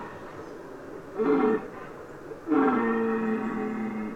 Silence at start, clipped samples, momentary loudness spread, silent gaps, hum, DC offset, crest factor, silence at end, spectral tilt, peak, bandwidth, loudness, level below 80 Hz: 0 s; under 0.1%; 18 LU; none; none; under 0.1%; 16 dB; 0 s; -8 dB/octave; -12 dBFS; 9 kHz; -27 LUFS; -60 dBFS